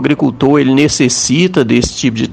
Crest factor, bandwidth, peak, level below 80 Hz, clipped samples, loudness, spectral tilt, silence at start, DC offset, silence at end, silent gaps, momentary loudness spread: 12 dB; 9.6 kHz; 0 dBFS; -34 dBFS; 0.2%; -11 LUFS; -4.5 dB/octave; 0 s; under 0.1%; 0 s; none; 4 LU